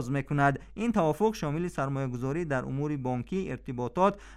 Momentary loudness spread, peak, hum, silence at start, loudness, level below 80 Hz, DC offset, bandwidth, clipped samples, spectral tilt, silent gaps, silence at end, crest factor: 7 LU; -10 dBFS; none; 0 s; -30 LUFS; -52 dBFS; under 0.1%; 13.5 kHz; under 0.1%; -7.5 dB/octave; none; 0 s; 18 dB